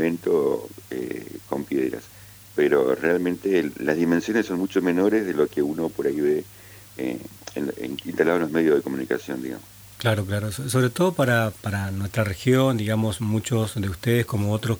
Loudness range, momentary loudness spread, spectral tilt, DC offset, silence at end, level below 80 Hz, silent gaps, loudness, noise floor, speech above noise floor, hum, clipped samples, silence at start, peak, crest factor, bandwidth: 3 LU; 11 LU; -6 dB/octave; under 0.1%; 0 s; -56 dBFS; none; -24 LUFS; -46 dBFS; 23 dB; none; under 0.1%; 0 s; -6 dBFS; 18 dB; over 20 kHz